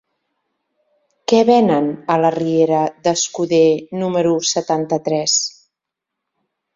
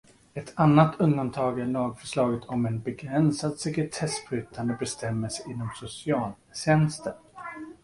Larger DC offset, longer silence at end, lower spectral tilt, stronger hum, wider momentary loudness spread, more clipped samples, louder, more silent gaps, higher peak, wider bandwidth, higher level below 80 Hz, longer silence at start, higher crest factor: neither; first, 1.25 s vs 0.1 s; second, -4 dB/octave vs -6 dB/octave; neither; second, 6 LU vs 15 LU; neither; first, -16 LUFS vs -27 LUFS; neither; first, 0 dBFS vs -6 dBFS; second, 7.8 kHz vs 11.5 kHz; second, -62 dBFS vs -56 dBFS; first, 1.3 s vs 0.35 s; about the same, 18 dB vs 22 dB